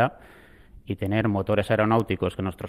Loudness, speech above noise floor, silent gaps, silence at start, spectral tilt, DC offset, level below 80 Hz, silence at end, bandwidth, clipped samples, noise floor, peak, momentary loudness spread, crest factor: -25 LUFS; 25 dB; none; 0 s; -7.5 dB/octave; under 0.1%; -52 dBFS; 0 s; 14.5 kHz; under 0.1%; -49 dBFS; -8 dBFS; 8 LU; 16 dB